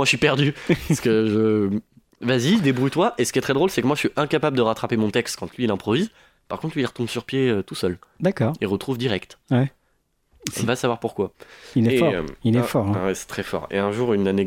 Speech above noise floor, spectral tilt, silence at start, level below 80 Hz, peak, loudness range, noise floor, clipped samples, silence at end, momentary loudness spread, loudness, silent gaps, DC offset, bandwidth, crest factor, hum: 46 dB; -5.5 dB/octave; 0 s; -52 dBFS; 0 dBFS; 4 LU; -67 dBFS; under 0.1%; 0 s; 9 LU; -22 LUFS; none; under 0.1%; 16.5 kHz; 22 dB; none